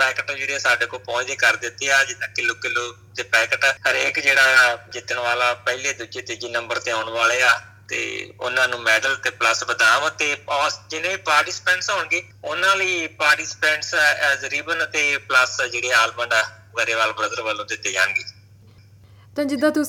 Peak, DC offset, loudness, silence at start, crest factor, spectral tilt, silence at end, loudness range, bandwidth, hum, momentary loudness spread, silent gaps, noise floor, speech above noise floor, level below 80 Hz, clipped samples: -2 dBFS; under 0.1%; -19 LUFS; 0 s; 20 dB; -1 dB/octave; 0 s; 3 LU; 18.5 kHz; none; 9 LU; none; -48 dBFS; 28 dB; -64 dBFS; under 0.1%